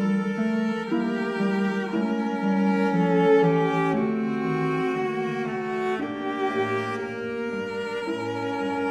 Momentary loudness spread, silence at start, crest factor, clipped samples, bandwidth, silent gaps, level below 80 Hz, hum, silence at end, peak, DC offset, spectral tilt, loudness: 8 LU; 0 s; 16 dB; under 0.1%; 10.5 kHz; none; -66 dBFS; none; 0 s; -10 dBFS; under 0.1%; -7.5 dB/octave; -25 LUFS